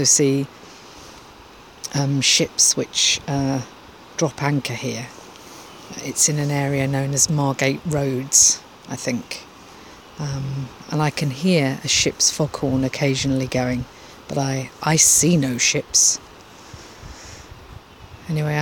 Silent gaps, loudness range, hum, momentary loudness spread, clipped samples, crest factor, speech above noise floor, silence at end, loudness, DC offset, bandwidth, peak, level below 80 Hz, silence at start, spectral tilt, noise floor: none; 5 LU; none; 22 LU; under 0.1%; 20 dB; 24 dB; 0 s; -19 LUFS; under 0.1%; 17 kHz; -2 dBFS; -50 dBFS; 0 s; -3 dB/octave; -44 dBFS